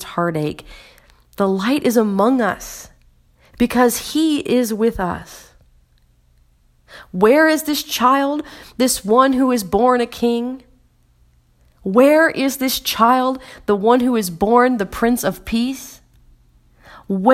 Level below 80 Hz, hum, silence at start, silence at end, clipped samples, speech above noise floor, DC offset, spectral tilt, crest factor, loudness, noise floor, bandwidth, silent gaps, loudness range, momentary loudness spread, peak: -46 dBFS; none; 0 s; 0 s; under 0.1%; 39 dB; under 0.1%; -4.5 dB/octave; 18 dB; -17 LUFS; -55 dBFS; 16.5 kHz; none; 4 LU; 13 LU; 0 dBFS